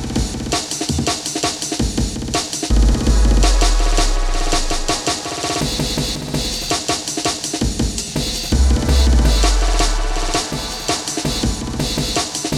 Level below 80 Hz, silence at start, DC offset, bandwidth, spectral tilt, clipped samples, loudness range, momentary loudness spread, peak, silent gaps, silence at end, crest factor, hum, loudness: -18 dBFS; 0 s; under 0.1%; 15 kHz; -3.5 dB/octave; under 0.1%; 2 LU; 6 LU; -2 dBFS; none; 0 s; 14 dB; none; -18 LUFS